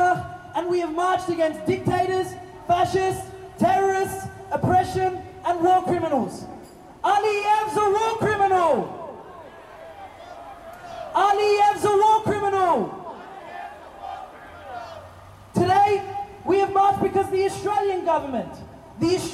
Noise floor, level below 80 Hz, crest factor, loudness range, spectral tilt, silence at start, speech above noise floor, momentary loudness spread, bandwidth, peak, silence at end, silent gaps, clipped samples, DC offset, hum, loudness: -44 dBFS; -54 dBFS; 12 dB; 4 LU; -5.5 dB/octave; 0 s; 23 dB; 21 LU; 14.5 kHz; -10 dBFS; 0 s; none; under 0.1%; under 0.1%; none; -22 LUFS